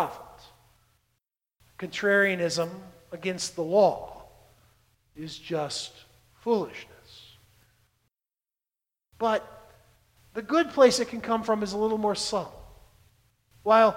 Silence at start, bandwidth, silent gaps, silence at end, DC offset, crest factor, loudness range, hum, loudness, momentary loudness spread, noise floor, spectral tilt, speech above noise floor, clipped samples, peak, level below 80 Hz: 0 s; 16.5 kHz; none; 0 s; under 0.1%; 22 dB; 10 LU; none; -26 LUFS; 22 LU; under -90 dBFS; -4 dB/octave; over 65 dB; under 0.1%; -6 dBFS; -62 dBFS